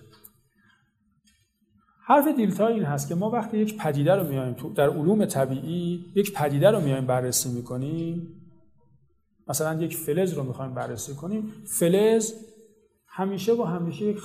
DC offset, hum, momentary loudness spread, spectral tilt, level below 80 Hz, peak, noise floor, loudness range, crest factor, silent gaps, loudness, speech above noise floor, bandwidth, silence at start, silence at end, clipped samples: under 0.1%; none; 12 LU; -5.5 dB/octave; -64 dBFS; -4 dBFS; -68 dBFS; 6 LU; 20 dB; none; -25 LUFS; 43 dB; 15 kHz; 2.05 s; 0 s; under 0.1%